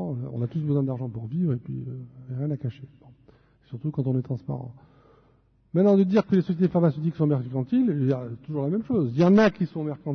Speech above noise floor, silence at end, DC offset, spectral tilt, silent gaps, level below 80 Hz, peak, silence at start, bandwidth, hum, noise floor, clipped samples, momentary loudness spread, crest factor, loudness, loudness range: 37 dB; 0 s; under 0.1%; -9.5 dB/octave; none; -60 dBFS; -8 dBFS; 0 s; 6.4 kHz; none; -61 dBFS; under 0.1%; 15 LU; 16 dB; -25 LUFS; 9 LU